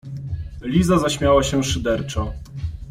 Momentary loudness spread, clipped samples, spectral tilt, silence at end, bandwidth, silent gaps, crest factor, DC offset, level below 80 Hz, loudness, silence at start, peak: 14 LU; under 0.1%; -5.5 dB/octave; 0 s; 15 kHz; none; 16 dB; under 0.1%; -34 dBFS; -20 LUFS; 0.05 s; -4 dBFS